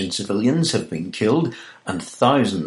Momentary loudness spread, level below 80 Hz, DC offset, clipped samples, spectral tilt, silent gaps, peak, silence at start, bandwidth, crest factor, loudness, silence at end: 12 LU; -60 dBFS; under 0.1%; under 0.1%; -5.5 dB/octave; none; -2 dBFS; 0 s; 11.5 kHz; 18 dB; -21 LUFS; 0 s